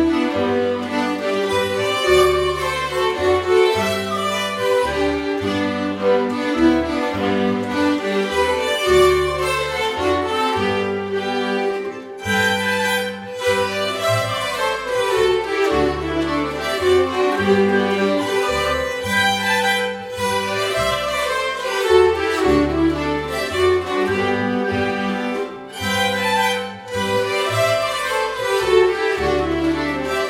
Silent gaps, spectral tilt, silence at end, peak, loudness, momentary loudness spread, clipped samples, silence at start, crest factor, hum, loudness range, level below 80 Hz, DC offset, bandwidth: none; -4.5 dB/octave; 0 s; -2 dBFS; -19 LUFS; 6 LU; under 0.1%; 0 s; 18 dB; none; 2 LU; -40 dBFS; under 0.1%; 16.5 kHz